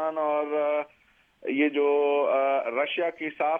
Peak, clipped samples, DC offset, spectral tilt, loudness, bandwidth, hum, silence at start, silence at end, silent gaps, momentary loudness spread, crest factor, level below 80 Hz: -12 dBFS; under 0.1%; under 0.1%; -6.5 dB/octave; -26 LUFS; 3.7 kHz; none; 0 s; 0 s; none; 8 LU; 14 dB; -80 dBFS